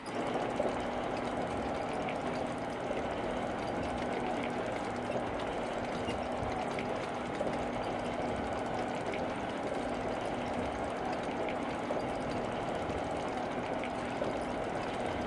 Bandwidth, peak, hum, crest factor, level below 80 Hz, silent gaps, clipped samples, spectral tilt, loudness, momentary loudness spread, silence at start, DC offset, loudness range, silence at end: 11.5 kHz; -18 dBFS; none; 18 dB; -54 dBFS; none; under 0.1%; -5.5 dB/octave; -36 LUFS; 1 LU; 0 s; under 0.1%; 0 LU; 0 s